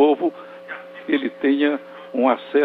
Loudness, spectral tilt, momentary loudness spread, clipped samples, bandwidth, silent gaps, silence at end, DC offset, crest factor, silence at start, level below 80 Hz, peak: -21 LUFS; -7 dB/octave; 16 LU; under 0.1%; 4.6 kHz; none; 0 s; under 0.1%; 16 dB; 0 s; -76 dBFS; -4 dBFS